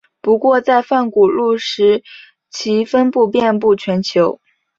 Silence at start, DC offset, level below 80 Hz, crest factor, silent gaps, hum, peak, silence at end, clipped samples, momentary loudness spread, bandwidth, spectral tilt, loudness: 0.25 s; under 0.1%; -58 dBFS; 14 dB; none; none; -2 dBFS; 0.45 s; under 0.1%; 6 LU; 7.8 kHz; -5.5 dB/octave; -15 LUFS